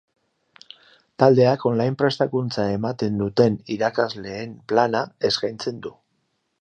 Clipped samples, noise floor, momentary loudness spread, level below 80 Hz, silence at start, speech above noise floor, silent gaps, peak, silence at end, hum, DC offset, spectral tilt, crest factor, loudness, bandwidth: under 0.1%; -72 dBFS; 13 LU; -58 dBFS; 1.2 s; 51 dB; none; -2 dBFS; 0.7 s; none; under 0.1%; -6.5 dB/octave; 20 dB; -22 LUFS; 9.2 kHz